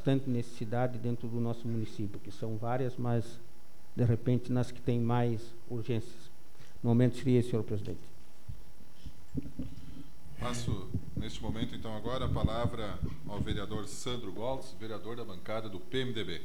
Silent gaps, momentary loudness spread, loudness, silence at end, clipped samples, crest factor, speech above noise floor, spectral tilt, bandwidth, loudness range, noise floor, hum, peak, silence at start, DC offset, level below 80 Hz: none; 18 LU; -35 LUFS; 0 s; under 0.1%; 20 dB; 23 dB; -7 dB/octave; 17 kHz; 8 LU; -57 dBFS; none; -14 dBFS; 0 s; 2%; -50 dBFS